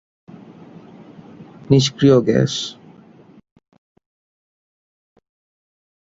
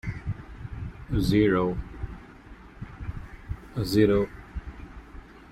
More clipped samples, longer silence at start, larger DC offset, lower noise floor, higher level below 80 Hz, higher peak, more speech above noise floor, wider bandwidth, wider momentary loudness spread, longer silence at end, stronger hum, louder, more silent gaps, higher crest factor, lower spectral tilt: neither; first, 1.4 s vs 0.05 s; neither; about the same, -46 dBFS vs -47 dBFS; second, -56 dBFS vs -40 dBFS; first, 0 dBFS vs -8 dBFS; first, 32 dB vs 25 dB; second, 7.8 kHz vs 16 kHz; about the same, 23 LU vs 25 LU; first, 3.3 s vs 0.1 s; neither; first, -16 LUFS vs -26 LUFS; neither; about the same, 22 dB vs 20 dB; second, -6 dB/octave vs -7.5 dB/octave